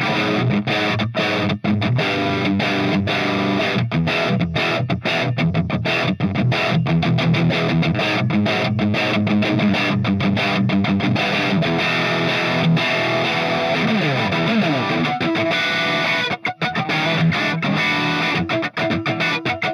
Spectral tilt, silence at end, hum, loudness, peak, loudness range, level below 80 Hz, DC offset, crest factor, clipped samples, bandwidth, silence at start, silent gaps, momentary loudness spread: -6 dB/octave; 0 s; none; -18 LUFS; -6 dBFS; 1 LU; -52 dBFS; under 0.1%; 12 dB; under 0.1%; 12.5 kHz; 0 s; none; 3 LU